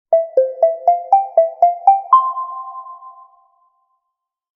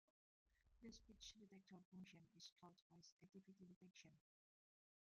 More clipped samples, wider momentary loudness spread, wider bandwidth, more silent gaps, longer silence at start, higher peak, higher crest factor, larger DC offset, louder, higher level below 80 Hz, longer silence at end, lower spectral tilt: neither; first, 17 LU vs 7 LU; second, 3.3 kHz vs 7.2 kHz; second, none vs 1.85-1.92 s, 2.52-2.56 s, 2.82-2.90 s, 3.12-3.17 s, 3.76-3.81 s; second, 0.1 s vs 0.45 s; first, 0 dBFS vs -48 dBFS; about the same, 16 dB vs 20 dB; neither; first, -15 LUFS vs -66 LUFS; about the same, -86 dBFS vs -84 dBFS; first, 1.45 s vs 0.9 s; second, -1 dB/octave vs -4 dB/octave